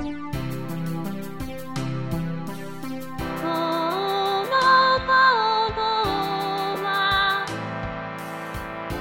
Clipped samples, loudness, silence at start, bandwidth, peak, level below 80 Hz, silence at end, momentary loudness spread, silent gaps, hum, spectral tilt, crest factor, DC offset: under 0.1%; -23 LUFS; 0 s; 17 kHz; -6 dBFS; -46 dBFS; 0 s; 15 LU; none; none; -5 dB/octave; 18 dB; under 0.1%